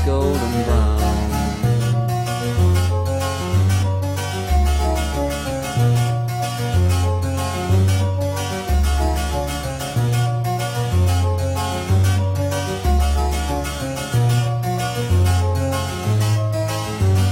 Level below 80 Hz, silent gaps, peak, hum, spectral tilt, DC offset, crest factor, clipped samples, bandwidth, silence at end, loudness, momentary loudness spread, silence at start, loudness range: -26 dBFS; none; -4 dBFS; none; -6 dB/octave; under 0.1%; 14 dB; under 0.1%; 16.5 kHz; 0 s; -20 LUFS; 5 LU; 0 s; 1 LU